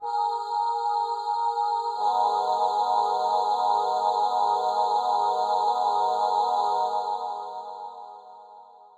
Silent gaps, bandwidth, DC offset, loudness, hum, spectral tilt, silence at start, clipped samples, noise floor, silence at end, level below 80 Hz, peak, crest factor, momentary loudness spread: none; 11.5 kHz; under 0.1%; -25 LUFS; none; -1.5 dB/octave; 0 s; under 0.1%; -49 dBFS; 0.2 s; under -90 dBFS; -12 dBFS; 12 dB; 11 LU